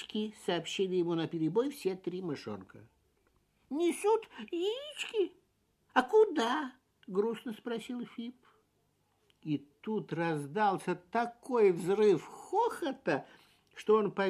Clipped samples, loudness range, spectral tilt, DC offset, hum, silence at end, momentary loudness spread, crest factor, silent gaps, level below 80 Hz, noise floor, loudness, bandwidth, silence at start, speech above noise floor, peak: under 0.1%; 8 LU; -5.5 dB/octave; under 0.1%; none; 0 s; 13 LU; 22 dB; none; -78 dBFS; -75 dBFS; -33 LUFS; 13.5 kHz; 0 s; 43 dB; -12 dBFS